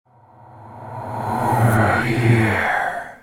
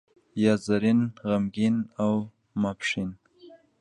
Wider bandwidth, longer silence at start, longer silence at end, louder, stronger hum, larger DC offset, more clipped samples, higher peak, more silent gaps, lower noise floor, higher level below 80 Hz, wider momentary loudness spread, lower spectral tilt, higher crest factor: first, 16.5 kHz vs 9.8 kHz; first, 0.5 s vs 0.35 s; second, 0.05 s vs 0.25 s; first, -18 LUFS vs -26 LUFS; neither; neither; neither; first, -2 dBFS vs -8 dBFS; neither; second, -47 dBFS vs -53 dBFS; first, -46 dBFS vs -60 dBFS; first, 16 LU vs 9 LU; about the same, -7 dB/octave vs -6.5 dB/octave; about the same, 18 dB vs 18 dB